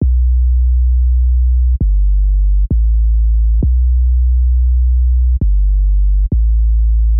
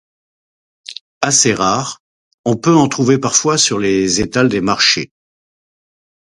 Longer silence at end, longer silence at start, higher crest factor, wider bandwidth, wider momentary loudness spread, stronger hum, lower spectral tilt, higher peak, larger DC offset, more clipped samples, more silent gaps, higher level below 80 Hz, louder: second, 0 s vs 1.35 s; second, 0 s vs 0.9 s; second, 2 dB vs 16 dB; second, 0.6 kHz vs 11.5 kHz; second, 1 LU vs 14 LU; neither; first, -19.5 dB/octave vs -3 dB/octave; second, -8 dBFS vs 0 dBFS; neither; neither; second, none vs 1.01-1.21 s, 2.00-2.44 s; first, -10 dBFS vs -46 dBFS; about the same, -14 LUFS vs -13 LUFS